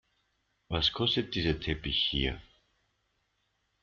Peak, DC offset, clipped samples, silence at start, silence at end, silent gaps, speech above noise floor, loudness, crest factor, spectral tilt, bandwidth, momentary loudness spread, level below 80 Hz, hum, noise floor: -14 dBFS; under 0.1%; under 0.1%; 0.7 s; 1.4 s; none; 46 dB; -30 LUFS; 20 dB; -5.5 dB/octave; 7.2 kHz; 8 LU; -46 dBFS; none; -77 dBFS